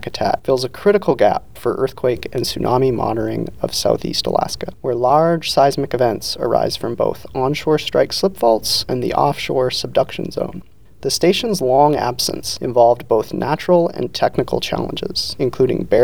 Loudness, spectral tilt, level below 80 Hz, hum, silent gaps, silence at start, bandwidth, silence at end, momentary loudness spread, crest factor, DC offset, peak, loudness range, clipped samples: -18 LUFS; -5 dB/octave; -44 dBFS; none; none; 0 s; over 20 kHz; 0 s; 8 LU; 16 dB; 1%; 0 dBFS; 2 LU; under 0.1%